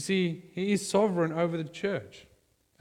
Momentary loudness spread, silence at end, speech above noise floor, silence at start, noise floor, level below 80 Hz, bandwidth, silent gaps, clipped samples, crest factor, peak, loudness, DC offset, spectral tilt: 8 LU; 0.6 s; 38 dB; 0 s; -67 dBFS; -68 dBFS; 15.5 kHz; none; under 0.1%; 18 dB; -12 dBFS; -29 LUFS; under 0.1%; -5.5 dB/octave